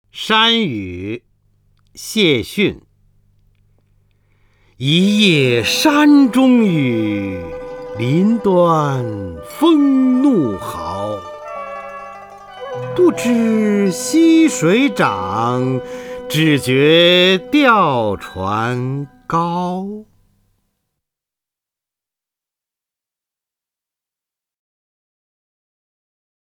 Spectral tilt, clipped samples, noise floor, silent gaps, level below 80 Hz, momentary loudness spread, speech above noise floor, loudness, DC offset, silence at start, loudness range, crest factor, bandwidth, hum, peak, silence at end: -5 dB/octave; under 0.1%; -88 dBFS; none; -52 dBFS; 18 LU; 74 dB; -14 LUFS; under 0.1%; 0.15 s; 8 LU; 16 dB; 19 kHz; none; 0 dBFS; 6.5 s